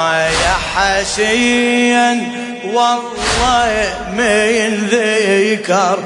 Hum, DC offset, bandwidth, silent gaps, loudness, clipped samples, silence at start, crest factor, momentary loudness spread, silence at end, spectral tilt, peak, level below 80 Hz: none; under 0.1%; 11 kHz; none; -13 LUFS; under 0.1%; 0 s; 12 dB; 5 LU; 0 s; -3 dB/octave; -2 dBFS; -34 dBFS